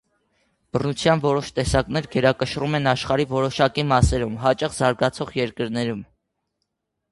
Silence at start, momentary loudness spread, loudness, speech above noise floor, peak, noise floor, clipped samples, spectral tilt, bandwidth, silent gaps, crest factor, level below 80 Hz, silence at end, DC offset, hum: 0.75 s; 7 LU; -22 LUFS; 56 dB; -4 dBFS; -77 dBFS; under 0.1%; -5.5 dB/octave; 11.5 kHz; none; 20 dB; -38 dBFS; 1.1 s; under 0.1%; none